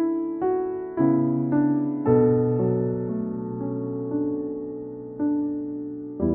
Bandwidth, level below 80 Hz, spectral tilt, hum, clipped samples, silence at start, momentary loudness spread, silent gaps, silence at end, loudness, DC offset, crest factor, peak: 2.8 kHz; -54 dBFS; -12.5 dB/octave; none; under 0.1%; 0 s; 12 LU; none; 0 s; -25 LUFS; under 0.1%; 16 dB; -8 dBFS